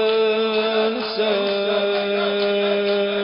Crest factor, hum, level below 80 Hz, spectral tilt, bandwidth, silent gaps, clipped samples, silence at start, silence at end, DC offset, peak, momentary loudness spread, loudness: 12 dB; none; -64 dBFS; -9 dB/octave; 5.4 kHz; none; under 0.1%; 0 s; 0 s; under 0.1%; -8 dBFS; 2 LU; -20 LUFS